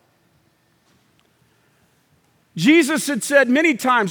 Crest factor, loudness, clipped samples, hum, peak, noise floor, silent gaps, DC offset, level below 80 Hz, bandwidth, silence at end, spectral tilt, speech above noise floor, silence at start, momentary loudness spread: 18 dB; -16 LUFS; under 0.1%; none; -2 dBFS; -61 dBFS; none; under 0.1%; -76 dBFS; over 20 kHz; 0 s; -4 dB/octave; 45 dB; 2.55 s; 6 LU